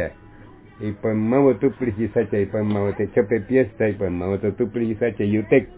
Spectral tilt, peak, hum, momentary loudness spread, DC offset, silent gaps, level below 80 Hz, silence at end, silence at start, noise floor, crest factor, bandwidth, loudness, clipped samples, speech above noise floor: -12 dB/octave; -4 dBFS; none; 7 LU; under 0.1%; none; -46 dBFS; 0 s; 0 s; -45 dBFS; 18 dB; 4 kHz; -22 LUFS; under 0.1%; 24 dB